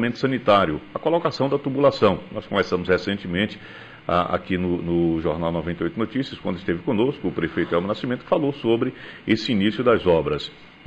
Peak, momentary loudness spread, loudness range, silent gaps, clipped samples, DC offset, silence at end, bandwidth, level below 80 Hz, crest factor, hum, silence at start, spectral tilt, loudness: -6 dBFS; 9 LU; 3 LU; none; under 0.1%; 0.1%; 0.2 s; 8.4 kHz; -48 dBFS; 16 dB; none; 0 s; -7 dB/octave; -22 LUFS